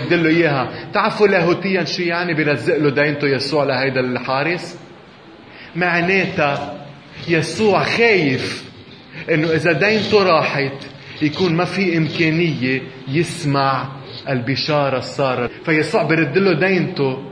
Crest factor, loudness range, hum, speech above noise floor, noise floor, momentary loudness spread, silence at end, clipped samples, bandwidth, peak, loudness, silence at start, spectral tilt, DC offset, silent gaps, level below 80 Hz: 18 dB; 3 LU; none; 24 dB; -41 dBFS; 11 LU; 0 s; under 0.1%; 10.5 kHz; 0 dBFS; -17 LUFS; 0 s; -6 dB/octave; under 0.1%; none; -56 dBFS